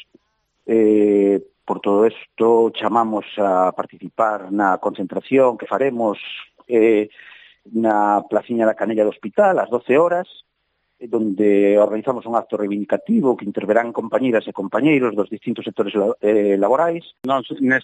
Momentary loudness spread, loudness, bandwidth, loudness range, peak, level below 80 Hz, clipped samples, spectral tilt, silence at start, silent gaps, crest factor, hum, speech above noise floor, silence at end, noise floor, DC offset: 9 LU; -18 LUFS; 9 kHz; 2 LU; -4 dBFS; -72 dBFS; under 0.1%; -7.5 dB/octave; 0.65 s; none; 16 dB; none; 52 dB; 0 s; -70 dBFS; under 0.1%